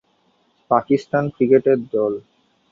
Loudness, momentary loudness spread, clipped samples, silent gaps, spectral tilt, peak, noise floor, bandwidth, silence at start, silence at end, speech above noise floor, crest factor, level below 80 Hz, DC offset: -19 LUFS; 7 LU; under 0.1%; none; -8.5 dB/octave; -2 dBFS; -62 dBFS; 7.2 kHz; 0.7 s; 0.5 s; 45 dB; 18 dB; -62 dBFS; under 0.1%